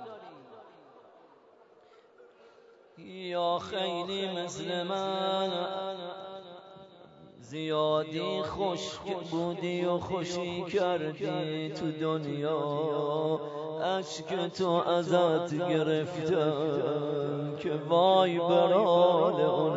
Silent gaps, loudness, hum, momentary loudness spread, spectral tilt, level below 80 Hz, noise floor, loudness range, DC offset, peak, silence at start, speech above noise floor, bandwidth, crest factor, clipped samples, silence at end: none; -30 LUFS; none; 13 LU; -6 dB/octave; -70 dBFS; -59 dBFS; 8 LU; under 0.1%; -12 dBFS; 0 s; 30 dB; 8 kHz; 18 dB; under 0.1%; 0 s